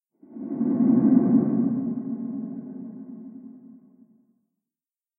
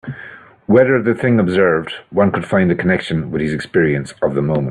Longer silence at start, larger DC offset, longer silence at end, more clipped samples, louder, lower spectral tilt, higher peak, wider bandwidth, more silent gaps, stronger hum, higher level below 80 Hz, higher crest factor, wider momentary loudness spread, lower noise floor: first, 0.3 s vs 0.05 s; neither; first, 1.5 s vs 0 s; neither; second, -23 LUFS vs -16 LUFS; first, -15 dB/octave vs -7.5 dB/octave; second, -6 dBFS vs 0 dBFS; second, 2.2 kHz vs 11 kHz; neither; neither; second, -72 dBFS vs -48 dBFS; about the same, 18 dB vs 16 dB; first, 23 LU vs 8 LU; first, under -90 dBFS vs -38 dBFS